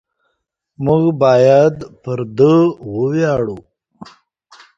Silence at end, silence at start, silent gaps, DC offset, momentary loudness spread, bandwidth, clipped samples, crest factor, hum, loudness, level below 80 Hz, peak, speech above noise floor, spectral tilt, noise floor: 1.2 s; 0.8 s; none; under 0.1%; 14 LU; 7.6 kHz; under 0.1%; 16 dB; none; -14 LUFS; -50 dBFS; 0 dBFS; 58 dB; -8 dB/octave; -71 dBFS